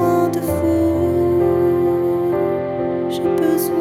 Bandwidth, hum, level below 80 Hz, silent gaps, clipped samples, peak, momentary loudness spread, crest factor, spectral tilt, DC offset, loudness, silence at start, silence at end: 16 kHz; none; -42 dBFS; none; under 0.1%; -4 dBFS; 5 LU; 12 dB; -7 dB/octave; under 0.1%; -18 LUFS; 0 s; 0 s